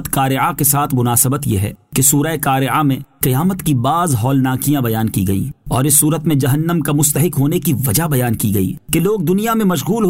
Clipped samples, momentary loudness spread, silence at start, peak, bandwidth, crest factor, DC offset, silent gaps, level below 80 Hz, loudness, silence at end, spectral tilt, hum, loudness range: under 0.1%; 6 LU; 0 s; 0 dBFS; 16.5 kHz; 14 dB; 0.3%; none; -40 dBFS; -15 LUFS; 0 s; -5 dB/octave; none; 1 LU